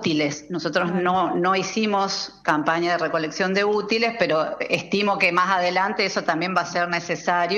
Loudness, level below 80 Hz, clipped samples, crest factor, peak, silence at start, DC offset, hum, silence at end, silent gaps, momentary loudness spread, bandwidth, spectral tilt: -22 LUFS; -62 dBFS; under 0.1%; 16 dB; -6 dBFS; 0 s; under 0.1%; none; 0 s; none; 5 LU; 11.5 kHz; -4.5 dB/octave